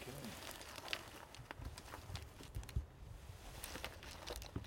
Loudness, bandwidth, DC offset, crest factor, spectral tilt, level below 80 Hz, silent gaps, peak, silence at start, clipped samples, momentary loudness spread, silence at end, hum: -50 LUFS; 16.5 kHz; under 0.1%; 32 dB; -3.5 dB/octave; -56 dBFS; none; -18 dBFS; 0 s; under 0.1%; 9 LU; 0 s; none